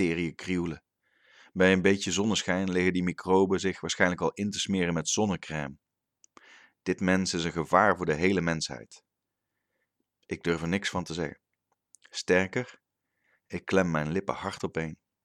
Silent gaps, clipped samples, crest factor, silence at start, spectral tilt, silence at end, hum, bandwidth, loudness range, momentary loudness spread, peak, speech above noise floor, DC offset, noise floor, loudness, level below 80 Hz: none; under 0.1%; 24 dB; 0 s; -4.5 dB/octave; 0.3 s; none; 12 kHz; 6 LU; 13 LU; -6 dBFS; 57 dB; under 0.1%; -85 dBFS; -28 LUFS; -58 dBFS